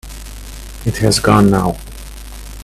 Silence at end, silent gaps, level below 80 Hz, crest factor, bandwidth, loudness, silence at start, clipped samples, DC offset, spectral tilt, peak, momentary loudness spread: 0 s; none; -30 dBFS; 16 dB; 15 kHz; -14 LUFS; 0.05 s; under 0.1%; under 0.1%; -5.5 dB/octave; 0 dBFS; 22 LU